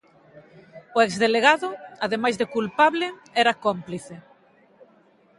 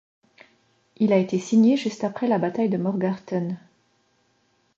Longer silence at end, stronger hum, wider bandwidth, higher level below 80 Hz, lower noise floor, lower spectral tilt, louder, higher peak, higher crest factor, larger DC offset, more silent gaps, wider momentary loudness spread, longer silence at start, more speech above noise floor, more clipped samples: about the same, 1.2 s vs 1.2 s; neither; first, 11.5 kHz vs 7.6 kHz; about the same, -68 dBFS vs -72 dBFS; second, -58 dBFS vs -67 dBFS; second, -4 dB/octave vs -7 dB/octave; about the same, -22 LUFS vs -23 LUFS; first, -2 dBFS vs -6 dBFS; about the same, 22 dB vs 18 dB; neither; neither; first, 14 LU vs 10 LU; second, 0.75 s vs 1 s; second, 35 dB vs 45 dB; neither